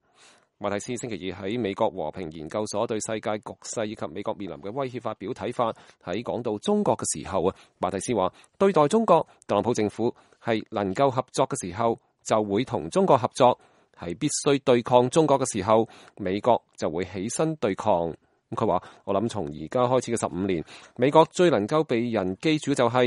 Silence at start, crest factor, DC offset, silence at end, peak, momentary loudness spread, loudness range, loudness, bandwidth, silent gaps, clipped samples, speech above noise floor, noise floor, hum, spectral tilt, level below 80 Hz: 0.6 s; 22 dB; under 0.1%; 0 s; -2 dBFS; 12 LU; 7 LU; -25 LUFS; 11.5 kHz; none; under 0.1%; 33 dB; -58 dBFS; none; -5 dB/octave; -60 dBFS